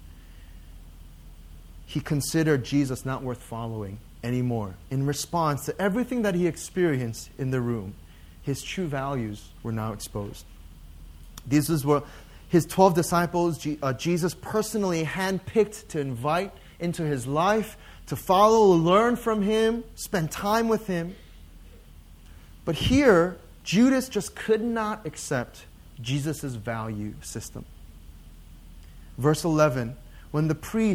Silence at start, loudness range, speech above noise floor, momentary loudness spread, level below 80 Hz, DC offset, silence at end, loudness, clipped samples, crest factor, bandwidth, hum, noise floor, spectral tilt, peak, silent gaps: 0 s; 9 LU; 23 dB; 16 LU; -46 dBFS; under 0.1%; 0 s; -26 LUFS; under 0.1%; 22 dB; 18 kHz; none; -48 dBFS; -5.5 dB/octave; -4 dBFS; none